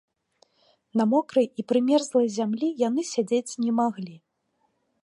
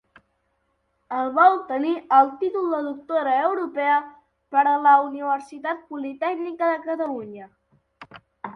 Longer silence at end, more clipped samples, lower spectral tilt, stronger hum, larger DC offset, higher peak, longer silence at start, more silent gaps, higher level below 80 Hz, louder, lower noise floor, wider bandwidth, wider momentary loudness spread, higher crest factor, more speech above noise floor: first, 0.85 s vs 0.05 s; neither; about the same, -5.5 dB/octave vs -5.5 dB/octave; second, none vs 50 Hz at -75 dBFS; neither; second, -10 dBFS vs -4 dBFS; second, 0.95 s vs 1.1 s; neither; second, -80 dBFS vs -72 dBFS; second, -25 LUFS vs -22 LUFS; about the same, -73 dBFS vs -71 dBFS; first, 11.5 kHz vs 6.2 kHz; second, 6 LU vs 13 LU; about the same, 16 dB vs 20 dB; about the same, 49 dB vs 49 dB